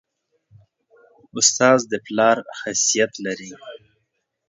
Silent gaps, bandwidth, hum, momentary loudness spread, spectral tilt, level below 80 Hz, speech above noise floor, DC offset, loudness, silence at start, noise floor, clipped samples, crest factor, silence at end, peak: none; 7.8 kHz; none; 20 LU; -2 dB/octave; -70 dBFS; 55 dB; under 0.1%; -18 LUFS; 1.35 s; -74 dBFS; under 0.1%; 20 dB; 0.7 s; -2 dBFS